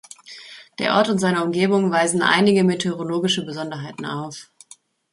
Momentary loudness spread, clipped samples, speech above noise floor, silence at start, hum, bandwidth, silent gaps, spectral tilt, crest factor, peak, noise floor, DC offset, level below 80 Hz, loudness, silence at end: 21 LU; under 0.1%; 31 dB; 0.25 s; none; 11.5 kHz; none; -4.5 dB/octave; 20 dB; -2 dBFS; -51 dBFS; under 0.1%; -64 dBFS; -20 LUFS; 0.7 s